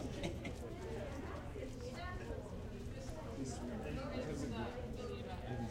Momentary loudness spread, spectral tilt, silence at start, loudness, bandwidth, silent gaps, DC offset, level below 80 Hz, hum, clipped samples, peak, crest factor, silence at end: 5 LU; -6 dB/octave; 0 s; -46 LUFS; 16 kHz; none; under 0.1%; -52 dBFS; none; under 0.1%; -26 dBFS; 18 dB; 0 s